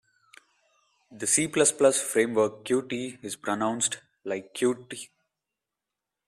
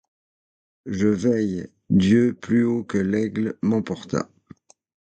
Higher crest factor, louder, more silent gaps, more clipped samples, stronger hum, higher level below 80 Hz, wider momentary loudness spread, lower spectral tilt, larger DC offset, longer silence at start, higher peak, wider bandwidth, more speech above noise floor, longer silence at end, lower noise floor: first, 22 dB vs 16 dB; second, -26 LUFS vs -22 LUFS; neither; neither; neither; second, -72 dBFS vs -52 dBFS; first, 15 LU vs 11 LU; second, -3 dB/octave vs -7.5 dB/octave; neither; first, 1.1 s vs 0.85 s; about the same, -8 dBFS vs -8 dBFS; first, 13.5 kHz vs 8.8 kHz; first, 61 dB vs 29 dB; first, 1.25 s vs 0.85 s; first, -87 dBFS vs -50 dBFS